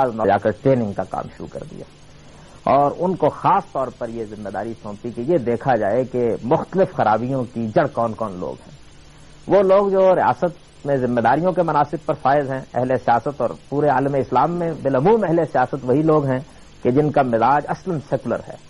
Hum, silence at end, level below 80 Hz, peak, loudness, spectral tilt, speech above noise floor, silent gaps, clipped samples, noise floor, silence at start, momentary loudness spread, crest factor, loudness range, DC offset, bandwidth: none; 0 s; -50 dBFS; -6 dBFS; -19 LUFS; -8 dB/octave; 24 dB; none; under 0.1%; -43 dBFS; 0 s; 12 LU; 14 dB; 4 LU; under 0.1%; 11 kHz